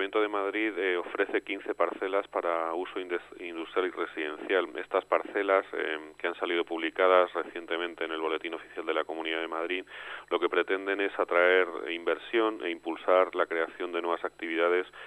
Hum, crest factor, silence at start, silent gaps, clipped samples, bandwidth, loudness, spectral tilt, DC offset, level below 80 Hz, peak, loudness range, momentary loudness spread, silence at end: 50 Hz at -70 dBFS; 22 dB; 0 s; none; under 0.1%; 10.5 kHz; -30 LUFS; -4 dB/octave; under 0.1%; -74 dBFS; -8 dBFS; 4 LU; 10 LU; 0 s